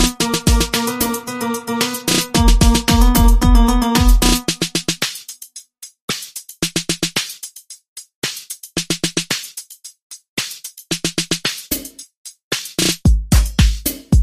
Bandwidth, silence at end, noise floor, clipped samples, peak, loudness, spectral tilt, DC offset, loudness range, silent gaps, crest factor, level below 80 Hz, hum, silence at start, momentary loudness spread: 15.5 kHz; 0 s; -39 dBFS; under 0.1%; 0 dBFS; -17 LUFS; -4 dB/octave; under 0.1%; 9 LU; 6.01-6.08 s, 7.88-7.96 s, 8.15-8.22 s, 10.02-10.10 s, 10.29-10.37 s, 12.17-12.25 s, 12.43-12.51 s; 16 dB; -20 dBFS; none; 0 s; 21 LU